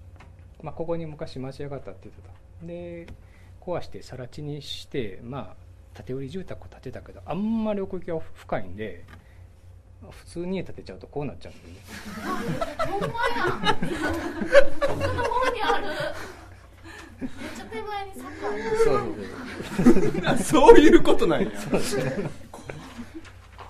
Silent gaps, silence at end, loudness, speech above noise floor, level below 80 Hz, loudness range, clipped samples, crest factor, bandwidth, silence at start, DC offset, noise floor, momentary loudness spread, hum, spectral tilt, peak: none; 0 s; -24 LUFS; 25 dB; -38 dBFS; 17 LU; under 0.1%; 24 dB; 13.5 kHz; 0 s; under 0.1%; -48 dBFS; 22 LU; none; -5.5 dB/octave; 0 dBFS